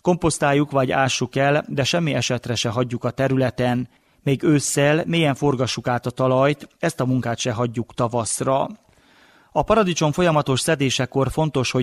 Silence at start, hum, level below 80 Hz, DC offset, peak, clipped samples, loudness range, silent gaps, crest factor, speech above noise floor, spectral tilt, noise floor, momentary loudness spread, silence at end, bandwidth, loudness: 0.05 s; none; -48 dBFS; under 0.1%; -4 dBFS; under 0.1%; 2 LU; none; 16 dB; 34 dB; -5 dB/octave; -54 dBFS; 6 LU; 0 s; 14.5 kHz; -21 LUFS